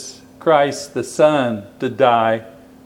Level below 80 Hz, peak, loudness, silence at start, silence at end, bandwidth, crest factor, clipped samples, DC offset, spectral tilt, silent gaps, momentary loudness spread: -62 dBFS; 0 dBFS; -17 LUFS; 0 s; 0.35 s; 15 kHz; 18 dB; under 0.1%; under 0.1%; -5 dB/octave; none; 11 LU